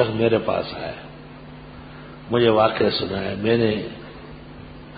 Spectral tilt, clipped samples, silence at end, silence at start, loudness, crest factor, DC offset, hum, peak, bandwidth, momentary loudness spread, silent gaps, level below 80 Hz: -11 dB/octave; under 0.1%; 0 s; 0 s; -21 LUFS; 20 dB; under 0.1%; none; -4 dBFS; 5 kHz; 22 LU; none; -48 dBFS